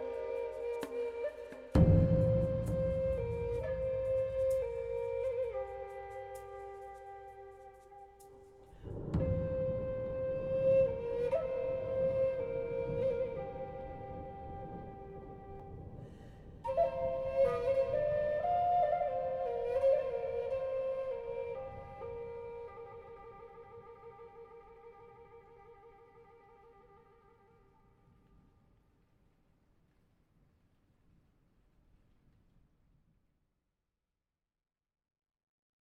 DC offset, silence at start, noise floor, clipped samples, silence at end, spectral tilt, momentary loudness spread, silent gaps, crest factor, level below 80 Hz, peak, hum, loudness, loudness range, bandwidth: under 0.1%; 0 s; under -90 dBFS; under 0.1%; 9.1 s; -9 dB/octave; 22 LU; none; 22 dB; -50 dBFS; -14 dBFS; none; -35 LUFS; 17 LU; 11.5 kHz